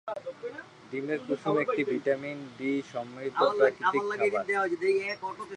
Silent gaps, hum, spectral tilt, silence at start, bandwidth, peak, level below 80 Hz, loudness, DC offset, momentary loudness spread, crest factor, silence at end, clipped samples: none; none; -5.5 dB/octave; 0.05 s; 10 kHz; -10 dBFS; -76 dBFS; -29 LUFS; under 0.1%; 14 LU; 20 dB; 0 s; under 0.1%